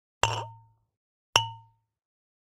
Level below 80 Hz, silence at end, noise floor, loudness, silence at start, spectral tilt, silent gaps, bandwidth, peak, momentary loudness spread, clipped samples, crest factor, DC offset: -56 dBFS; 0.8 s; -54 dBFS; -28 LUFS; 0.25 s; -1.5 dB/octave; 0.97-1.33 s; 16 kHz; -2 dBFS; 13 LU; under 0.1%; 32 dB; under 0.1%